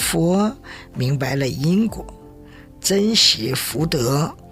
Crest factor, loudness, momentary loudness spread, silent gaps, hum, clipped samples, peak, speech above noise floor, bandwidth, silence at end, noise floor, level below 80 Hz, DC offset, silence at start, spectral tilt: 18 dB; -19 LUFS; 14 LU; none; none; under 0.1%; -2 dBFS; 23 dB; 16.5 kHz; 0 s; -42 dBFS; -44 dBFS; under 0.1%; 0 s; -4 dB/octave